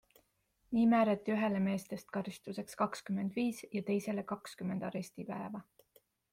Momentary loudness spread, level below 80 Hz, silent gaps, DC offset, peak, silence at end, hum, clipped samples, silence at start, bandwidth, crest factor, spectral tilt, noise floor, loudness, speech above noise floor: 13 LU; -74 dBFS; none; under 0.1%; -18 dBFS; 0.7 s; none; under 0.1%; 0.7 s; 15.5 kHz; 18 dB; -6.5 dB/octave; -76 dBFS; -36 LUFS; 41 dB